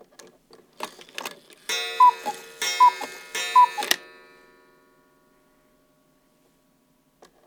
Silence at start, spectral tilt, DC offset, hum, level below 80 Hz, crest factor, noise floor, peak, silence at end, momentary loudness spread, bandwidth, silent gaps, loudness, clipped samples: 0.8 s; 1 dB/octave; under 0.1%; none; -76 dBFS; 24 dB; -64 dBFS; -2 dBFS; 3.45 s; 20 LU; over 20 kHz; none; -21 LUFS; under 0.1%